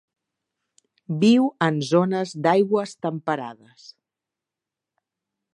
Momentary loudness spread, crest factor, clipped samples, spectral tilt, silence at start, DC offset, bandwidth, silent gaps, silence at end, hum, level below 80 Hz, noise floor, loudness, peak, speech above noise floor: 11 LU; 20 dB; under 0.1%; -6.5 dB/octave; 1.1 s; under 0.1%; 10.5 kHz; none; 2 s; none; -74 dBFS; -87 dBFS; -22 LUFS; -4 dBFS; 66 dB